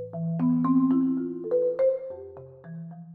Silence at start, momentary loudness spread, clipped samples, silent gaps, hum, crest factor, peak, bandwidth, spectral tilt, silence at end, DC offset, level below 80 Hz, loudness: 0 s; 20 LU; under 0.1%; none; none; 12 dB; -14 dBFS; 2.5 kHz; -13 dB/octave; 0 s; under 0.1%; -68 dBFS; -25 LUFS